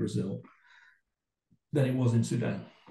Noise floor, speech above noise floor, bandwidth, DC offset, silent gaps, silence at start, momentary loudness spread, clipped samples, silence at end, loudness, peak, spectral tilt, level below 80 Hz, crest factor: -86 dBFS; 56 dB; 12 kHz; under 0.1%; none; 0 s; 12 LU; under 0.1%; 0.2 s; -31 LUFS; -16 dBFS; -7.5 dB/octave; -68 dBFS; 16 dB